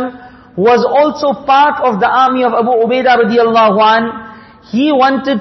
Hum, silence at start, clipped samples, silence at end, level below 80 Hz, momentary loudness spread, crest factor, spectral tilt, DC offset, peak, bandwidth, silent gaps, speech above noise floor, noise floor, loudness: none; 0 s; under 0.1%; 0 s; -52 dBFS; 8 LU; 12 dB; -6 dB/octave; under 0.1%; 0 dBFS; 6.2 kHz; none; 21 dB; -32 dBFS; -11 LUFS